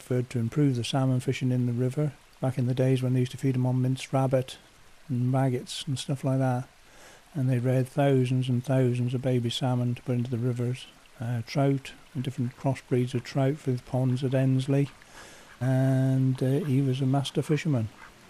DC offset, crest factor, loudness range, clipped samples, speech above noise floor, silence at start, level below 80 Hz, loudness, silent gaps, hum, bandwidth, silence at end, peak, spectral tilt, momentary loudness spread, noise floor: under 0.1%; 14 dB; 3 LU; under 0.1%; 25 dB; 0 s; -60 dBFS; -27 LUFS; none; none; 12.5 kHz; 0.2 s; -14 dBFS; -7.5 dB/octave; 8 LU; -52 dBFS